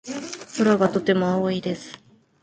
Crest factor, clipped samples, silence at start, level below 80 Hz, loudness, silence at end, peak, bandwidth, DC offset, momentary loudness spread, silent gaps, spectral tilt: 18 dB; under 0.1%; 0.05 s; -62 dBFS; -22 LUFS; 0.45 s; -6 dBFS; 9.2 kHz; under 0.1%; 14 LU; none; -6 dB/octave